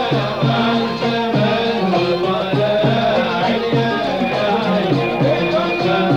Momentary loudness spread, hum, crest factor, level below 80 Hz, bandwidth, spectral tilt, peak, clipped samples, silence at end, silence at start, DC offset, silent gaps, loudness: 2 LU; none; 12 dB; -48 dBFS; 15 kHz; -7 dB/octave; -4 dBFS; under 0.1%; 0 s; 0 s; 0.2%; none; -17 LUFS